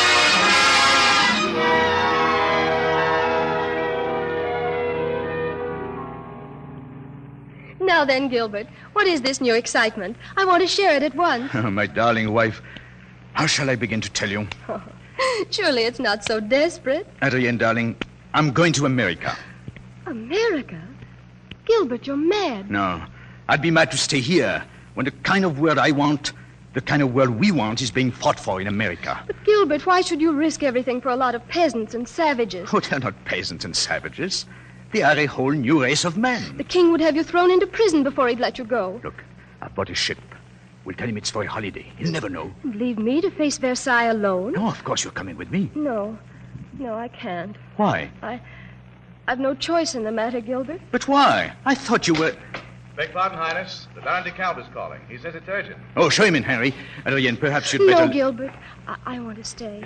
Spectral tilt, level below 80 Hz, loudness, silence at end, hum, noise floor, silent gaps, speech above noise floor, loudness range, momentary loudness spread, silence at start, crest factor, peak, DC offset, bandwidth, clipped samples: -4 dB/octave; -52 dBFS; -21 LUFS; 0 s; none; -46 dBFS; none; 25 dB; 8 LU; 16 LU; 0 s; 18 dB; -4 dBFS; under 0.1%; 12 kHz; under 0.1%